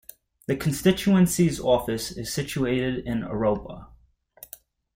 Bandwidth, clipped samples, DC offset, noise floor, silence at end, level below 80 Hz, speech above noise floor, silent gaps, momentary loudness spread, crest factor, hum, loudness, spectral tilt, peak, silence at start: 16.5 kHz; under 0.1%; under 0.1%; -57 dBFS; 1.1 s; -48 dBFS; 34 dB; none; 23 LU; 20 dB; none; -24 LUFS; -5.5 dB/octave; -6 dBFS; 0.5 s